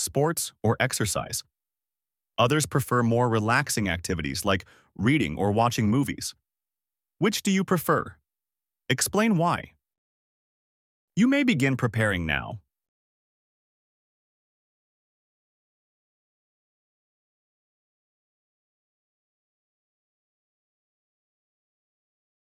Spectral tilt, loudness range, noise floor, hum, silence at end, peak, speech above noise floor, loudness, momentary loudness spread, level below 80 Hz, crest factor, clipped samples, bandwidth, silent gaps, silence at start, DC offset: -4.5 dB/octave; 4 LU; under -90 dBFS; none; 10 s; -8 dBFS; over 65 dB; -25 LUFS; 8 LU; -54 dBFS; 22 dB; under 0.1%; 17 kHz; 9.98-11.08 s; 0 s; under 0.1%